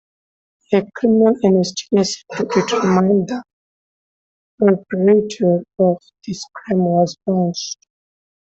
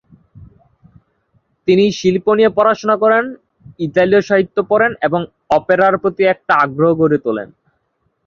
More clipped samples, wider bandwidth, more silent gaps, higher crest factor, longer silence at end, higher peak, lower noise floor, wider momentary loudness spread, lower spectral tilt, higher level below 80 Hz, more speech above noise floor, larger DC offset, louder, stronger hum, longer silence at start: neither; first, 8 kHz vs 7.2 kHz; first, 3.53-4.58 s vs none; about the same, 16 dB vs 14 dB; about the same, 0.75 s vs 0.8 s; about the same, -2 dBFS vs 0 dBFS; first, under -90 dBFS vs -66 dBFS; first, 13 LU vs 9 LU; about the same, -6 dB/octave vs -6.5 dB/octave; second, -60 dBFS vs -54 dBFS; first, over 74 dB vs 52 dB; neither; second, -17 LUFS vs -14 LUFS; neither; first, 0.7 s vs 0.35 s